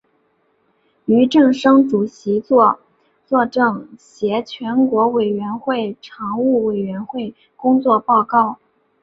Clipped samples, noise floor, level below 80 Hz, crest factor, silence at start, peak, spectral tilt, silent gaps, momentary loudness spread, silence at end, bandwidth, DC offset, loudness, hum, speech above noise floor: under 0.1%; -62 dBFS; -62 dBFS; 16 dB; 1.1 s; -2 dBFS; -7 dB/octave; none; 14 LU; 0.5 s; 7.8 kHz; under 0.1%; -17 LUFS; none; 46 dB